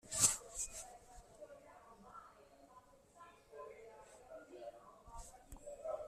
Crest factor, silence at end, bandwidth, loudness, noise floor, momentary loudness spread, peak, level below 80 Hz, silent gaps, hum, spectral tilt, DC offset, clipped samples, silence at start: 32 dB; 0 s; 13.5 kHz; -39 LUFS; -65 dBFS; 22 LU; -16 dBFS; -64 dBFS; none; none; -1 dB/octave; under 0.1%; under 0.1%; 0.05 s